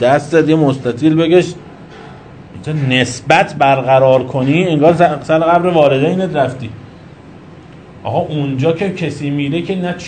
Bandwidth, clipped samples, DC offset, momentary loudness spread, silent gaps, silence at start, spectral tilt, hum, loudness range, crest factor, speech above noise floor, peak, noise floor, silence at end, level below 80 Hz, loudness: 9.4 kHz; 0.1%; 0.1%; 12 LU; none; 0 s; -6.5 dB/octave; none; 8 LU; 14 dB; 24 dB; 0 dBFS; -36 dBFS; 0 s; -48 dBFS; -13 LUFS